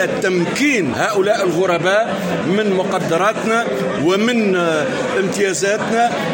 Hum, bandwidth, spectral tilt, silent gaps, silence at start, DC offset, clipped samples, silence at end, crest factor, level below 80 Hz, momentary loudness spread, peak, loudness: none; 17 kHz; -4.5 dB/octave; none; 0 s; under 0.1%; under 0.1%; 0 s; 12 dB; -56 dBFS; 3 LU; -4 dBFS; -16 LUFS